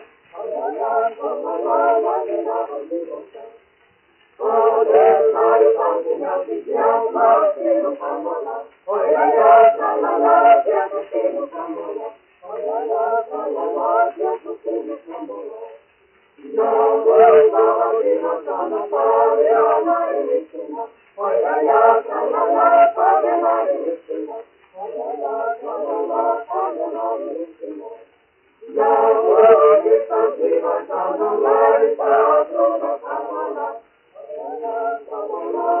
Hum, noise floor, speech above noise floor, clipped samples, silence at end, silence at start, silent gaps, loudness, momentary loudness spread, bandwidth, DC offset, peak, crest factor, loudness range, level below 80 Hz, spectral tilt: none; -58 dBFS; 41 dB; under 0.1%; 0 s; 0 s; none; -17 LUFS; 17 LU; 3.2 kHz; under 0.1%; 0 dBFS; 18 dB; 8 LU; -74 dBFS; -3 dB/octave